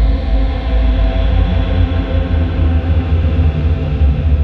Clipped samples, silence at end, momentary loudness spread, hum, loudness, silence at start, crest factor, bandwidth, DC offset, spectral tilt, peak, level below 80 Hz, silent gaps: under 0.1%; 0 s; 2 LU; none; -15 LUFS; 0 s; 10 dB; 4.8 kHz; under 0.1%; -9.5 dB/octave; -2 dBFS; -14 dBFS; none